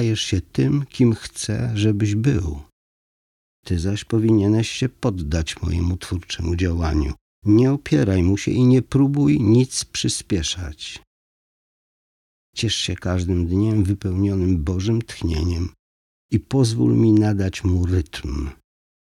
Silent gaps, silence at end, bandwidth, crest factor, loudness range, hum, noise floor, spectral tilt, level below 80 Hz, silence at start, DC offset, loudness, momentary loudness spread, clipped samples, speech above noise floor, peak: 2.72-3.63 s, 7.21-7.42 s, 11.07-12.53 s, 15.79-16.29 s; 0.45 s; 12.5 kHz; 16 dB; 6 LU; none; under -90 dBFS; -6 dB/octave; -38 dBFS; 0 s; under 0.1%; -20 LUFS; 11 LU; under 0.1%; over 71 dB; -6 dBFS